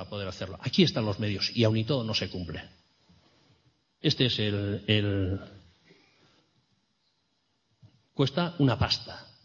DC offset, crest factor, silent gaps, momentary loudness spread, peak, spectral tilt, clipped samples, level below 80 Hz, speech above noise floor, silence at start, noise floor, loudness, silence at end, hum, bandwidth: under 0.1%; 22 dB; none; 12 LU; -8 dBFS; -6 dB/octave; under 0.1%; -56 dBFS; 47 dB; 0 s; -74 dBFS; -28 LUFS; 0.2 s; none; 7.2 kHz